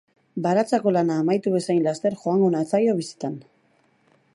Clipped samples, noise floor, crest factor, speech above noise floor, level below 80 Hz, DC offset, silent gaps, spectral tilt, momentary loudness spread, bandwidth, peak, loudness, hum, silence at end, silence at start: under 0.1%; -63 dBFS; 16 dB; 41 dB; -74 dBFS; under 0.1%; none; -7 dB/octave; 11 LU; 11.5 kHz; -8 dBFS; -22 LUFS; none; 0.95 s; 0.35 s